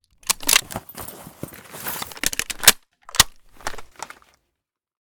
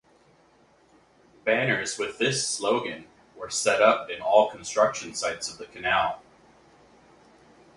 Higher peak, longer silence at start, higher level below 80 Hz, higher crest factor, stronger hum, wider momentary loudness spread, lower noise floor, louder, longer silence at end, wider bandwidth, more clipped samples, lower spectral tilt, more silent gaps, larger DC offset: first, 0 dBFS vs -4 dBFS; second, 0.3 s vs 1.45 s; first, -44 dBFS vs -64 dBFS; about the same, 24 dB vs 22 dB; neither; first, 23 LU vs 13 LU; first, -81 dBFS vs -60 dBFS; first, -19 LUFS vs -25 LUFS; second, 1.1 s vs 1.55 s; first, over 20 kHz vs 11.5 kHz; neither; second, 0.5 dB/octave vs -2.5 dB/octave; neither; neither